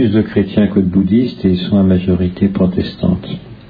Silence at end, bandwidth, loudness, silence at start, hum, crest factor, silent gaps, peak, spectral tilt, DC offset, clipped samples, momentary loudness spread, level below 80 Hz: 0.05 s; 5 kHz; -14 LUFS; 0 s; none; 12 dB; none; -2 dBFS; -10.5 dB/octave; under 0.1%; under 0.1%; 5 LU; -38 dBFS